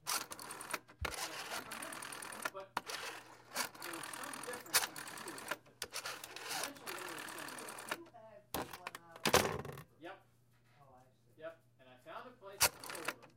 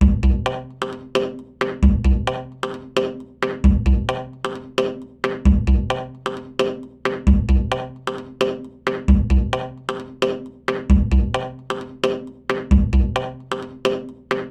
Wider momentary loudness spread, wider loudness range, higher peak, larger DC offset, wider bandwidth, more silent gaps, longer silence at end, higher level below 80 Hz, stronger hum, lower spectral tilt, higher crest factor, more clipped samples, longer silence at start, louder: first, 19 LU vs 12 LU; first, 5 LU vs 2 LU; second, -12 dBFS vs -2 dBFS; neither; first, 17 kHz vs 9.2 kHz; neither; about the same, 0.05 s vs 0 s; second, -66 dBFS vs -22 dBFS; neither; second, -1.5 dB/octave vs -7 dB/octave; first, 30 dB vs 18 dB; neither; about the same, 0.05 s vs 0 s; second, -40 LUFS vs -22 LUFS